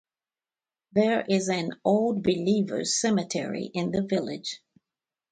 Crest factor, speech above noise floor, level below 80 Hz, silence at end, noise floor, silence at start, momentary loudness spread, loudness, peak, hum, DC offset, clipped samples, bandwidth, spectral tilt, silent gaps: 18 dB; over 64 dB; -64 dBFS; 0.75 s; under -90 dBFS; 0.95 s; 8 LU; -26 LUFS; -10 dBFS; none; under 0.1%; under 0.1%; 9.4 kHz; -4.5 dB/octave; none